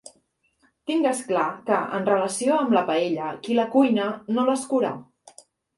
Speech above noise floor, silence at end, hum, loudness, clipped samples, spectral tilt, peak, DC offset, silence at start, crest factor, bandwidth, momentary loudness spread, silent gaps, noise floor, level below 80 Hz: 45 dB; 0.75 s; none; -23 LUFS; under 0.1%; -4.5 dB/octave; -6 dBFS; under 0.1%; 0.85 s; 18 dB; 11.5 kHz; 7 LU; none; -67 dBFS; -72 dBFS